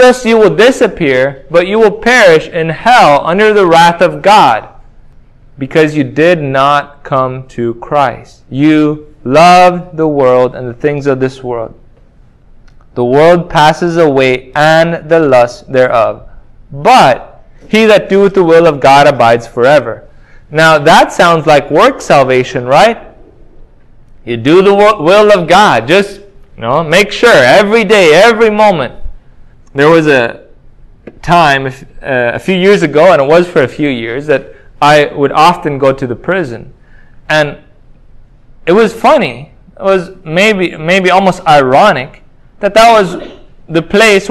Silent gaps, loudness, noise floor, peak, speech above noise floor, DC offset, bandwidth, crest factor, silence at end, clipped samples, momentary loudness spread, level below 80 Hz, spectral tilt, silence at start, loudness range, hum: none; -8 LUFS; -41 dBFS; 0 dBFS; 33 dB; under 0.1%; 16 kHz; 8 dB; 0 s; 3%; 11 LU; -38 dBFS; -5 dB/octave; 0 s; 5 LU; none